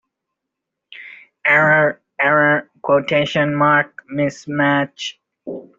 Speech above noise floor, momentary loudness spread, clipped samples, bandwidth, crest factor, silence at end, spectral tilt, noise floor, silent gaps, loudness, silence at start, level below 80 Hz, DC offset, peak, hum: 63 dB; 19 LU; under 0.1%; 7.6 kHz; 16 dB; 0.15 s; -5.5 dB/octave; -81 dBFS; none; -16 LUFS; 0.9 s; -62 dBFS; under 0.1%; -2 dBFS; none